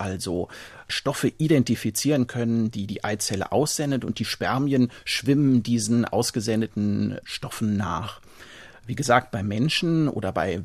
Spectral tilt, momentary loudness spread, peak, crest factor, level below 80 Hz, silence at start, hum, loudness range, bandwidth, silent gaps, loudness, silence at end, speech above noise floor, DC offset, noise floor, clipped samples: -5 dB/octave; 10 LU; -4 dBFS; 20 dB; -54 dBFS; 0 s; none; 3 LU; 14.5 kHz; none; -24 LUFS; 0 s; 22 dB; under 0.1%; -46 dBFS; under 0.1%